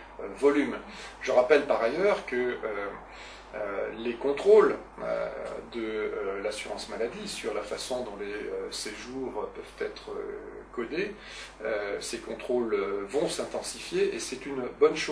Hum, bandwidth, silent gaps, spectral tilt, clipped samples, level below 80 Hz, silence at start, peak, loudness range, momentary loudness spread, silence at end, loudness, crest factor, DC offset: none; 11 kHz; none; -3.5 dB/octave; under 0.1%; -56 dBFS; 0 s; -6 dBFS; 8 LU; 14 LU; 0 s; -30 LUFS; 22 dB; under 0.1%